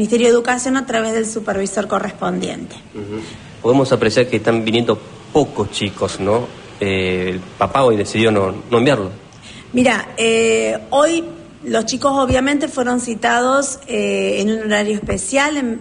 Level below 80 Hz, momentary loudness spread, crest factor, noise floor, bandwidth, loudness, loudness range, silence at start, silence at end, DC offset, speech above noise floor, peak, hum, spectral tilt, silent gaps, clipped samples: -44 dBFS; 11 LU; 14 dB; -38 dBFS; 10.5 kHz; -17 LUFS; 3 LU; 0 s; 0 s; under 0.1%; 21 dB; -2 dBFS; none; -4.5 dB/octave; none; under 0.1%